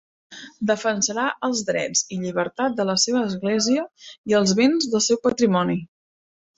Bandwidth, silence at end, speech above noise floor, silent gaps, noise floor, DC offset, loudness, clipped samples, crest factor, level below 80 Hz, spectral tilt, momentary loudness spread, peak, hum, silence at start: 8.2 kHz; 0.7 s; over 69 dB; 4.18-4.24 s; under -90 dBFS; under 0.1%; -21 LUFS; under 0.1%; 16 dB; -62 dBFS; -3.5 dB/octave; 8 LU; -6 dBFS; none; 0.3 s